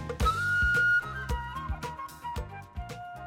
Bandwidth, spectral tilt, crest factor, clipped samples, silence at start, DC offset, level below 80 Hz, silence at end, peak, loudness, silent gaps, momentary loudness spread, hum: 16.5 kHz; -4.5 dB/octave; 16 dB; under 0.1%; 0 s; under 0.1%; -38 dBFS; 0 s; -14 dBFS; -29 LUFS; none; 17 LU; none